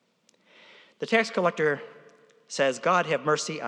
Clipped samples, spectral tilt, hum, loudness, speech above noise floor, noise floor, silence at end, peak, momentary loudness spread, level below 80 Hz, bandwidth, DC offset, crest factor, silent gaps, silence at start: under 0.1%; -4 dB/octave; none; -26 LUFS; 40 dB; -66 dBFS; 0 s; -8 dBFS; 14 LU; under -90 dBFS; 11 kHz; under 0.1%; 20 dB; none; 1 s